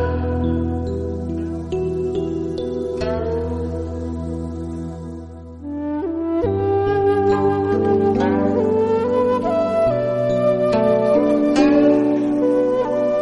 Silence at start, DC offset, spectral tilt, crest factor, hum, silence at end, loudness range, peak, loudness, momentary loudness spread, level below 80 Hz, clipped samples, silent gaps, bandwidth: 0 s; under 0.1%; -8 dB/octave; 16 dB; none; 0 s; 9 LU; -4 dBFS; -19 LUFS; 11 LU; -36 dBFS; under 0.1%; none; 11 kHz